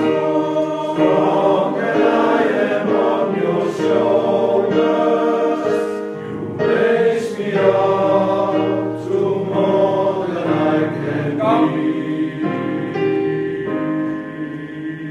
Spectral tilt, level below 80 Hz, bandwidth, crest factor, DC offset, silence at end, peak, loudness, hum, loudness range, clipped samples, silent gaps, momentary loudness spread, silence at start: -7.5 dB/octave; -60 dBFS; 10.5 kHz; 16 dB; under 0.1%; 0 s; -2 dBFS; -18 LUFS; none; 3 LU; under 0.1%; none; 7 LU; 0 s